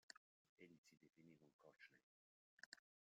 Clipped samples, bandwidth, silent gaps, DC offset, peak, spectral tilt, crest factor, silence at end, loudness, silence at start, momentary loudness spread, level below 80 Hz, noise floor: under 0.1%; 7.4 kHz; 0.17-0.57 s, 0.78-0.84 s, 1.53-1.59 s, 2.03-2.58 s, 2.66-2.72 s; under 0.1%; -40 dBFS; -2 dB/octave; 30 dB; 0.4 s; -67 LUFS; 0.1 s; 5 LU; under -90 dBFS; under -90 dBFS